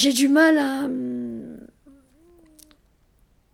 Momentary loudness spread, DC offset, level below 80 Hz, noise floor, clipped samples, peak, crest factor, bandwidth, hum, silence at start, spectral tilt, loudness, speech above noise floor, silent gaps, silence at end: 19 LU; under 0.1%; -62 dBFS; -60 dBFS; under 0.1%; -6 dBFS; 18 dB; 16 kHz; none; 0 s; -2.5 dB/octave; -20 LUFS; 42 dB; none; 1.9 s